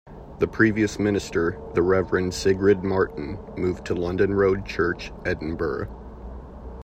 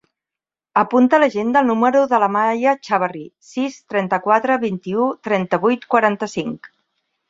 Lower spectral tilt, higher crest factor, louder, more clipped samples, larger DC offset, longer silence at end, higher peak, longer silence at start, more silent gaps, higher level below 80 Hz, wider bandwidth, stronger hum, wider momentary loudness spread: about the same, -6 dB/octave vs -6 dB/octave; about the same, 20 dB vs 16 dB; second, -24 LUFS vs -18 LUFS; neither; neither; second, 0 s vs 0.65 s; about the same, -4 dBFS vs -2 dBFS; second, 0.05 s vs 0.75 s; neither; first, -42 dBFS vs -64 dBFS; first, 13 kHz vs 7.8 kHz; neither; first, 18 LU vs 10 LU